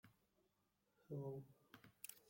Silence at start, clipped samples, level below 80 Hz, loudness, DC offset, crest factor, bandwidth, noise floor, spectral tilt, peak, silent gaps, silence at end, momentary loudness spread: 0.05 s; under 0.1%; -88 dBFS; -54 LUFS; under 0.1%; 22 dB; 16.5 kHz; -85 dBFS; -5.5 dB/octave; -34 dBFS; none; 0 s; 16 LU